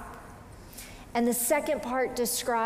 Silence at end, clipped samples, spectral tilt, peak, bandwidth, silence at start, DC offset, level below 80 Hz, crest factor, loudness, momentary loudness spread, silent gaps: 0 s; under 0.1%; -3 dB/octave; -14 dBFS; 16 kHz; 0 s; under 0.1%; -54 dBFS; 16 dB; -28 LUFS; 20 LU; none